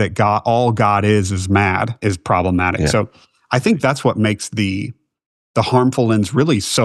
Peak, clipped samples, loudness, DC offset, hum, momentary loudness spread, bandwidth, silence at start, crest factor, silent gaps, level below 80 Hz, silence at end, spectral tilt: 0 dBFS; under 0.1%; -17 LUFS; under 0.1%; none; 6 LU; 12.5 kHz; 0 s; 16 dB; 5.26-5.54 s; -42 dBFS; 0 s; -5.5 dB/octave